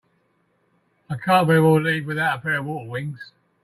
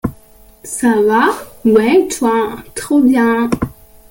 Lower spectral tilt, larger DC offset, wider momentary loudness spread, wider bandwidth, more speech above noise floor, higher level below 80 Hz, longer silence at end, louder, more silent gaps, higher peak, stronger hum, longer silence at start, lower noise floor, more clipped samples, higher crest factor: first, -6.5 dB/octave vs -5 dB/octave; neither; first, 16 LU vs 13 LU; second, 14.5 kHz vs 17 kHz; first, 46 dB vs 31 dB; second, -62 dBFS vs -40 dBFS; about the same, 0.4 s vs 0.4 s; second, -20 LUFS vs -13 LUFS; neither; about the same, -4 dBFS vs -2 dBFS; neither; first, 1.1 s vs 0.05 s; first, -66 dBFS vs -44 dBFS; neither; first, 18 dB vs 12 dB